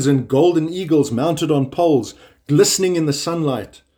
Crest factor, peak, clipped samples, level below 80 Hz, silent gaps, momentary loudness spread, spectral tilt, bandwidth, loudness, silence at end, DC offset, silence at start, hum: 16 dB; -2 dBFS; under 0.1%; -56 dBFS; none; 6 LU; -5.5 dB/octave; over 20 kHz; -17 LUFS; 0.3 s; under 0.1%; 0 s; none